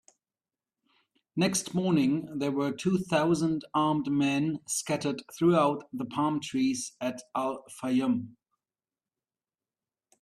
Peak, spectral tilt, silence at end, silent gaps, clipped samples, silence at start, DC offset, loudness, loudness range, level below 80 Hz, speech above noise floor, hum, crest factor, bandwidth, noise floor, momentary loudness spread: -12 dBFS; -5 dB/octave; 1.9 s; none; under 0.1%; 1.35 s; under 0.1%; -29 LUFS; 5 LU; -68 dBFS; over 62 dB; none; 18 dB; 13.5 kHz; under -90 dBFS; 9 LU